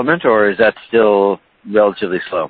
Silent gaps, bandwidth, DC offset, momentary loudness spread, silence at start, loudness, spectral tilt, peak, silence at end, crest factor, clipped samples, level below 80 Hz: none; 4.7 kHz; under 0.1%; 7 LU; 0 s; -14 LUFS; -9.5 dB/octave; 0 dBFS; 0 s; 14 dB; under 0.1%; -54 dBFS